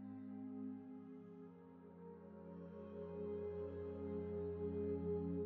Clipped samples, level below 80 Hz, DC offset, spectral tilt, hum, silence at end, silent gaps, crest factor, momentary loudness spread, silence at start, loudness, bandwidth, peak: under 0.1%; -68 dBFS; under 0.1%; -10.5 dB/octave; none; 0 s; none; 14 dB; 15 LU; 0 s; -48 LUFS; 4.4 kHz; -32 dBFS